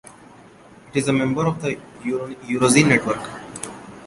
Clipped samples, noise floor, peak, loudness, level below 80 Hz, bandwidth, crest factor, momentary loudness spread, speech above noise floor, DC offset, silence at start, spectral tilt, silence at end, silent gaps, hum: under 0.1%; -46 dBFS; -2 dBFS; -20 LUFS; -54 dBFS; 11.5 kHz; 20 dB; 18 LU; 26 dB; under 0.1%; 0.05 s; -4.5 dB/octave; 0 s; none; none